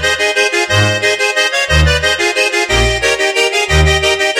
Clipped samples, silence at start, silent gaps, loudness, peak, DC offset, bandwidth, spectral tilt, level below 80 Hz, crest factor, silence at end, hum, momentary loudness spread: under 0.1%; 0 s; none; -11 LUFS; 0 dBFS; under 0.1%; 16 kHz; -3 dB/octave; -22 dBFS; 12 dB; 0 s; none; 2 LU